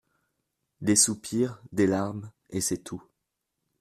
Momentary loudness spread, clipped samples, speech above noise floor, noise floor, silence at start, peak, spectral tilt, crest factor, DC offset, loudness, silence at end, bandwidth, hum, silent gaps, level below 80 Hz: 18 LU; under 0.1%; 56 dB; -83 dBFS; 0.8 s; -8 dBFS; -3.5 dB/octave; 22 dB; under 0.1%; -26 LUFS; 0.8 s; 14.5 kHz; none; none; -64 dBFS